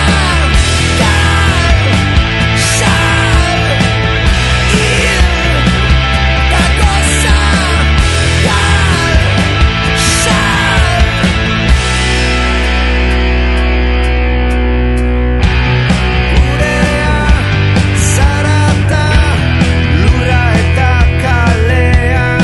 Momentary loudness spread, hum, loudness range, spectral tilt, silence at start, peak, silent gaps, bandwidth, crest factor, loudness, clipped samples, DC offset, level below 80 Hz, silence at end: 2 LU; none; 2 LU; -4.5 dB/octave; 0 s; 0 dBFS; none; 12 kHz; 10 dB; -10 LUFS; 0.2%; under 0.1%; -14 dBFS; 0 s